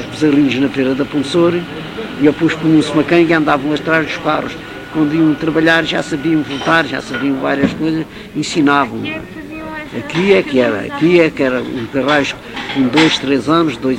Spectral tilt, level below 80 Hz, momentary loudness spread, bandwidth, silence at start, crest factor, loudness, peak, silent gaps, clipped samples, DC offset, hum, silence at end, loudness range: -5.5 dB/octave; -44 dBFS; 12 LU; 11 kHz; 0 s; 14 dB; -14 LUFS; 0 dBFS; none; under 0.1%; under 0.1%; none; 0 s; 2 LU